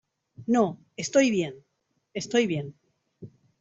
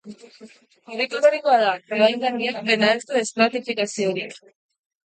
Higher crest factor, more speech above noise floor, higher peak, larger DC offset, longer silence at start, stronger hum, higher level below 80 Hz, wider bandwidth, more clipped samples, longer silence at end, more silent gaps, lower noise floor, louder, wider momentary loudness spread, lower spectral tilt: about the same, 20 dB vs 18 dB; about the same, 24 dB vs 27 dB; second, -8 dBFS vs -4 dBFS; neither; first, 0.4 s vs 0.05 s; neither; first, -68 dBFS vs -76 dBFS; second, 8 kHz vs 9.4 kHz; neither; second, 0.35 s vs 0.7 s; neither; about the same, -49 dBFS vs -48 dBFS; second, -26 LUFS vs -21 LUFS; first, 16 LU vs 8 LU; first, -5 dB/octave vs -3.5 dB/octave